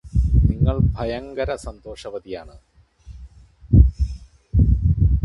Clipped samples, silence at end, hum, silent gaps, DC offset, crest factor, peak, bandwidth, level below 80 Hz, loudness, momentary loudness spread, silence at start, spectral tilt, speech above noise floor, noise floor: under 0.1%; 0 s; none; none; under 0.1%; 20 dB; 0 dBFS; 10.5 kHz; -22 dBFS; -20 LUFS; 19 LU; 0.05 s; -9 dB/octave; 19 dB; -43 dBFS